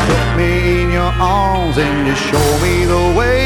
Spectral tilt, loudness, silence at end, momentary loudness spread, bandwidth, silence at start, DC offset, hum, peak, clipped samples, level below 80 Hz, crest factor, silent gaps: -5.5 dB/octave; -14 LUFS; 0 s; 2 LU; 17.5 kHz; 0 s; under 0.1%; none; -2 dBFS; under 0.1%; -22 dBFS; 12 dB; none